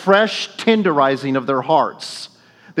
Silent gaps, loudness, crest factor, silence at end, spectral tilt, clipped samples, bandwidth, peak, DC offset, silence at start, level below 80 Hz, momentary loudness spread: none; -17 LUFS; 18 dB; 0 s; -5 dB/octave; under 0.1%; 12.5 kHz; 0 dBFS; under 0.1%; 0 s; -72 dBFS; 15 LU